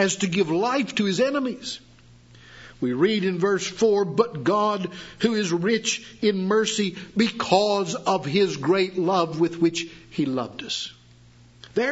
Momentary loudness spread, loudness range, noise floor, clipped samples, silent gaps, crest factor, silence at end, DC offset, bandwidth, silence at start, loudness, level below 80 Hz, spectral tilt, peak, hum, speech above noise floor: 8 LU; 2 LU; -51 dBFS; under 0.1%; none; 20 dB; 0 s; under 0.1%; 8 kHz; 0 s; -23 LUFS; -62 dBFS; -4.5 dB/octave; -4 dBFS; none; 28 dB